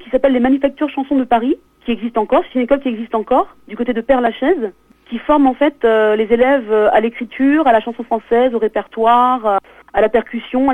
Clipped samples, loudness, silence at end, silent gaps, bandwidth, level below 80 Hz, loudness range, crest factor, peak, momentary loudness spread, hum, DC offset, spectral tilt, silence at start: under 0.1%; -15 LUFS; 0 s; none; 9.2 kHz; -44 dBFS; 3 LU; 14 dB; 0 dBFS; 9 LU; none; under 0.1%; -7 dB/octave; 0 s